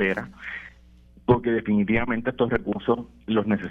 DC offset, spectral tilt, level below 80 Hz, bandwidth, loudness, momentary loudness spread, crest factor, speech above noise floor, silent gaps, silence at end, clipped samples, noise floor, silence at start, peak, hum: under 0.1%; -9 dB/octave; -46 dBFS; 4.5 kHz; -25 LUFS; 13 LU; 20 dB; 28 dB; none; 0 s; under 0.1%; -52 dBFS; 0 s; -4 dBFS; 60 Hz at -50 dBFS